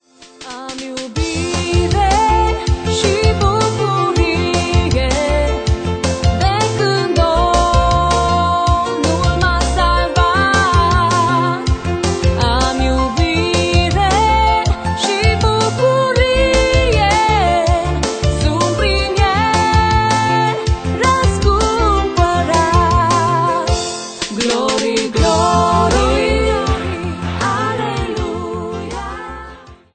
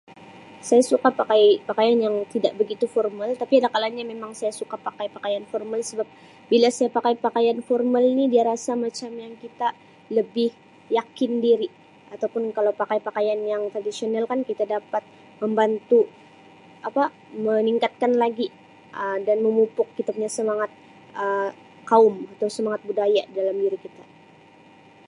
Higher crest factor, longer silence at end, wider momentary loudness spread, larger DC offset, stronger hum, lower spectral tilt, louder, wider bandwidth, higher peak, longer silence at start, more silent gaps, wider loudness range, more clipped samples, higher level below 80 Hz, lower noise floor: second, 14 dB vs 20 dB; second, 0.2 s vs 1.05 s; second, 8 LU vs 11 LU; neither; neither; about the same, -5 dB/octave vs -4.5 dB/octave; first, -15 LUFS vs -23 LUFS; second, 9.4 kHz vs 11.5 kHz; first, 0 dBFS vs -4 dBFS; about the same, 0.2 s vs 0.1 s; neither; about the same, 2 LU vs 4 LU; neither; first, -22 dBFS vs -78 dBFS; second, -37 dBFS vs -51 dBFS